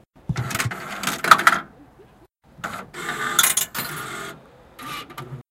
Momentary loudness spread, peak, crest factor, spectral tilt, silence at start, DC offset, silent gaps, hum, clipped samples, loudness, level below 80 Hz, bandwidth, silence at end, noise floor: 20 LU; 0 dBFS; 24 dB; -1.5 dB/octave; 0.3 s; under 0.1%; none; none; under 0.1%; -21 LUFS; -54 dBFS; 17 kHz; 0.1 s; -53 dBFS